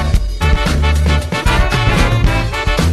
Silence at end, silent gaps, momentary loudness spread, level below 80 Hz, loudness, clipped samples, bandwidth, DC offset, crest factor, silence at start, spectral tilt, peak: 0 s; none; 3 LU; -16 dBFS; -14 LUFS; under 0.1%; 13.5 kHz; under 0.1%; 12 dB; 0 s; -5.5 dB/octave; 0 dBFS